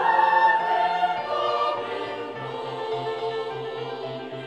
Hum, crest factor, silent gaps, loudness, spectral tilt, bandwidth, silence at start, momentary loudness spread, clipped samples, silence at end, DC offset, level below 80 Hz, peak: none; 16 dB; none; -25 LUFS; -5 dB/octave; 9.2 kHz; 0 s; 13 LU; under 0.1%; 0 s; under 0.1%; -70 dBFS; -8 dBFS